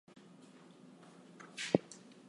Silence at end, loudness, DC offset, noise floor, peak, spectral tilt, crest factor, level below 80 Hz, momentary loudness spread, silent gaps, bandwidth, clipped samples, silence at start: 0.15 s; -38 LUFS; under 0.1%; -59 dBFS; -10 dBFS; -5 dB/octave; 32 dB; -80 dBFS; 23 LU; none; 11.5 kHz; under 0.1%; 0.85 s